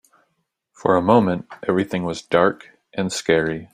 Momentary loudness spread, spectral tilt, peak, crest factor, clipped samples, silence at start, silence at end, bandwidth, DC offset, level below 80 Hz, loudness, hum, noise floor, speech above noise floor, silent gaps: 10 LU; -5.5 dB/octave; -2 dBFS; 20 dB; under 0.1%; 0.85 s; 0.1 s; 14.5 kHz; under 0.1%; -56 dBFS; -20 LUFS; none; -73 dBFS; 53 dB; none